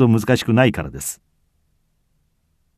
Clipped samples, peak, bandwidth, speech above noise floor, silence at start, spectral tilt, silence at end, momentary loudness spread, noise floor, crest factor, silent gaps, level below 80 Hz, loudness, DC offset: under 0.1%; -2 dBFS; 14 kHz; 48 dB; 0 s; -6 dB/octave; 1.65 s; 13 LU; -65 dBFS; 20 dB; none; -46 dBFS; -18 LUFS; under 0.1%